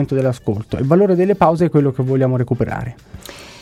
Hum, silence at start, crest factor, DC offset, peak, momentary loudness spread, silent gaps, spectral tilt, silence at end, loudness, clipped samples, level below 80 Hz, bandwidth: none; 0 s; 16 dB; under 0.1%; -2 dBFS; 20 LU; none; -8.5 dB/octave; 0 s; -16 LUFS; under 0.1%; -42 dBFS; 14.5 kHz